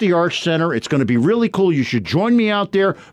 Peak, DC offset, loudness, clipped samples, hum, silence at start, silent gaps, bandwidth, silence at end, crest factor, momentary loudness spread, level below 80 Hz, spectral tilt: -6 dBFS; under 0.1%; -17 LUFS; under 0.1%; none; 0 s; none; 11 kHz; 0.1 s; 10 dB; 3 LU; -56 dBFS; -6.5 dB/octave